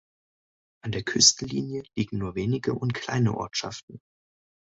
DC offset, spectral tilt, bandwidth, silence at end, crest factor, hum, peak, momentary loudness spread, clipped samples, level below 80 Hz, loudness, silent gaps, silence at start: under 0.1%; -3 dB/octave; 8.2 kHz; 0.7 s; 24 dB; none; -4 dBFS; 15 LU; under 0.1%; -54 dBFS; -25 LUFS; 3.83-3.88 s; 0.85 s